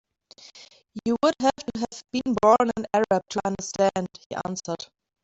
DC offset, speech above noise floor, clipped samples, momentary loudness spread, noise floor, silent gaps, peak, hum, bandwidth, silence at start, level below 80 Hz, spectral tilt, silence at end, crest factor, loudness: under 0.1%; 28 dB; under 0.1%; 14 LU; -52 dBFS; 4.26-4.30 s; -6 dBFS; none; 8.2 kHz; 0.55 s; -58 dBFS; -4.5 dB/octave; 0.4 s; 20 dB; -25 LUFS